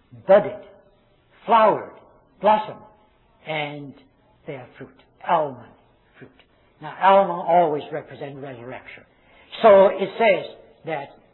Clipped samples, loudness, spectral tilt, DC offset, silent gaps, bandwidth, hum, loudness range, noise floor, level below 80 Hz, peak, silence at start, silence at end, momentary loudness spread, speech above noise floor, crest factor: under 0.1%; -19 LUFS; -9.5 dB/octave; under 0.1%; none; 4.2 kHz; none; 10 LU; -58 dBFS; -62 dBFS; -4 dBFS; 0.15 s; 0.3 s; 22 LU; 38 dB; 18 dB